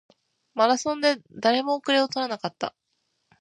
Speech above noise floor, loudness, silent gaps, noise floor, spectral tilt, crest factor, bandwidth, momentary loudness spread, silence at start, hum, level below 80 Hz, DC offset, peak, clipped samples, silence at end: 51 dB; -24 LUFS; none; -75 dBFS; -3 dB/octave; 20 dB; 10.5 kHz; 11 LU; 0.55 s; none; -74 dBFS; under 0.1%; -4 dBFS; under 0.1%; 0.7 s